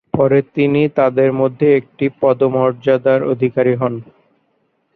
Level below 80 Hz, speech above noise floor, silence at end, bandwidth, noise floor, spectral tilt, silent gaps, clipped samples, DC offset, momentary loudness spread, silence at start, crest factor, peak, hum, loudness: -54 dBFS; 49 dB; 0.95 s; 4.5 kHz; -64 dBFS; -10 dB/octave; none; under 0.1%; under 0.1%; 4 LU; 0.15 s; 14 dB; -2 dBFS; none; -15 LUFS